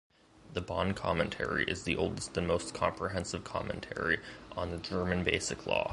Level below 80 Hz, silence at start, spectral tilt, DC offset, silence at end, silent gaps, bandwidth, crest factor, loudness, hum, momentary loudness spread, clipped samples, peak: -50 dBFS; 0.45 s; -4.5 dB/octave; under 0.1%; 0 s; none; 11.5 kHz; 24 dB; -34 LUFS; none; 7 LU; under 0.1%; -10 dBFS